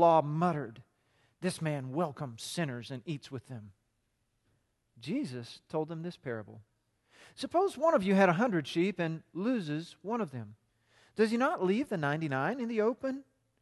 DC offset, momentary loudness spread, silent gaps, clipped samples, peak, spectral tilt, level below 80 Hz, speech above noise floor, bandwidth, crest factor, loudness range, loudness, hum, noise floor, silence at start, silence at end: under 0.1%; 17 LU; none; under 0.1%; -12 dBFS; -6.5 dB/octave; -74 dBFS; 46 dB; 12.5 kHz; 20 dB; 11 LU; -32 LUFS; none; -78 dBFS; 0 s; 0.4 s